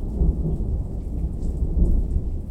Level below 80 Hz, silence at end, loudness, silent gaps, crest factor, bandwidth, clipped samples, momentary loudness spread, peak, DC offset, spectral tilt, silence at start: -24 dBFS; 0 s; -26 LUFS; none; 14 dB; 1.4 kHz; under 0.1%; 6 LU; -8 dBFS; under 0.1%; -11 dB/octave; 0 s